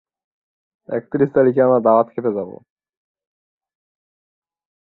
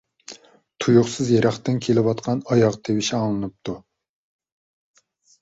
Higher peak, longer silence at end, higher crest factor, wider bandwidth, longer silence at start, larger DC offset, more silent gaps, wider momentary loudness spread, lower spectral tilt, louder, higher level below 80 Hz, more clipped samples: about the same, -2 dBFS vs -4 dBFS; first, 2.35 s vs 1.65 s; about the same, 20 dB vs 20 dB; second, 4.1 kHz vs 8 kHz; first, 0.9 s vs 0.3 s; neither; neither; second, 13 LU vs 17 LU; first, -12 dB/octave vs -6 dB/octave; first, -17 LUFS vs -21 LUFS; second, -66 dBFS vs -56 dBFS; neither